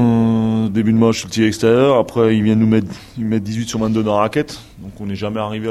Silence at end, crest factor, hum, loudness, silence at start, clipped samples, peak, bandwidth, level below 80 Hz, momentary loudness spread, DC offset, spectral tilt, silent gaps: 0 s; 14 dB; none; -16 LUFS; 0 s; under 0.1%; -2 dBFS; 12.5 kHz; -46 dBFS; 13 LU; under 0.1%; -6.5 dB/octave; none